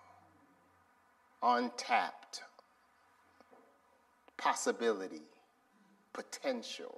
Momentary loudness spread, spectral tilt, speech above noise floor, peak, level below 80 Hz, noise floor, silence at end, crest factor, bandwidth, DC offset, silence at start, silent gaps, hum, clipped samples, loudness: 17 LU; -1.5 dB/octave; 34 dB; -18 dBFS; under -90 dBFS; -70 dBFS; 0 s; 22 dB; 13.5 kHz; under 0.1%; 1.4 s; none; none; under 0.1%; -36 LUFS